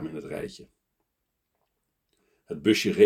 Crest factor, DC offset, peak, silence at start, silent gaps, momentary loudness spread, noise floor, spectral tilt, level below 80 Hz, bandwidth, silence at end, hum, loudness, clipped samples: 22 dB; under 0.1%; -6 dBFS; 0 s; none; 17 LU; -80 dBFS; -5 dB/octave; -64 dBFS; 16 kHz; 0 s; none; -28 LUFS; under 0.1%